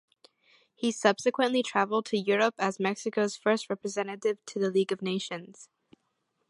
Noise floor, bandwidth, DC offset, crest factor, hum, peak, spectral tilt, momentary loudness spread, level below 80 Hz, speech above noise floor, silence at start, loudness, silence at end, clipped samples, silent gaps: -78 dBFS; 11.5 kHz; under 0.1%; 22 dB; none; -8 dBFS; -4 dB/octave; 7 LU; -80 dBFS; 49 dB; 0.8 s; -29 LUFS; 0.85 s; under 0.1%; none